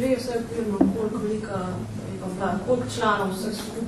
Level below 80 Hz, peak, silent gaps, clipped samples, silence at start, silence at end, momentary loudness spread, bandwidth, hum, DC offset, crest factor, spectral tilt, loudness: -48 dBFS; -6 dBFS; none; under 0.1%; 0 s; 0 s; 9 LU; 13.5 kHz; none; under 0.1%; 20 dB; -6 dB/octave; -26 LUFS